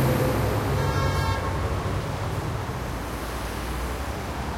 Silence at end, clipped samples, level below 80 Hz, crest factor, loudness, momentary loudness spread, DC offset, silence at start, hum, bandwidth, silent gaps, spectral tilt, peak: 0 s; under 0.1%; -34 dBFS; 14 dB; -27 LUFS; 7 LU; under 0.1%; 0 s; none; 16.5 kHz; none; -6 dB/octave; -12 dBFS